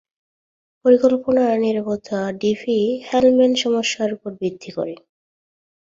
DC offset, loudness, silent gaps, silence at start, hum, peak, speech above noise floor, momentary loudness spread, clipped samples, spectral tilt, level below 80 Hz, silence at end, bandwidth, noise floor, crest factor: under 0.1%; -19 LUFS; none; 0.85 s; none; -2 dBFS; over 72 dB; 12 LU; under 0.1%; -5 dB/octave; -60 dBFS; 1 s; 7.8 kHz; under -90 dBFS; 18 dB